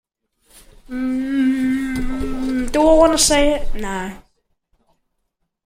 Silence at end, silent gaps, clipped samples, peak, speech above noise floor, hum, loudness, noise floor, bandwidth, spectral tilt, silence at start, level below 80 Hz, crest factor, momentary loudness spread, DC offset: 1.45 s; none; under 0.1%; -2 dBFS; 57 dB; none; -18 LUFS; -72 dBFS; 16 kHz; -3 dB/octave; 0.9 s; -30 dBFS; 18 dB; 14 LU; under 0.1%